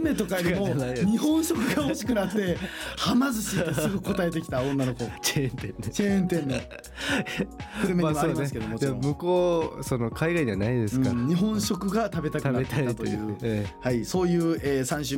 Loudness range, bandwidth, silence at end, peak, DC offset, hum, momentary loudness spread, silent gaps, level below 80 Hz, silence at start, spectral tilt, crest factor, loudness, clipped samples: 2 LU; 17 kHz; 0 s; -12 dBFS; under 0.1%; none; 6 LU; none; -46 dBFS; 0 s; -5.5 dB/octave; 14 dB; -27 LUFS; under 0.1%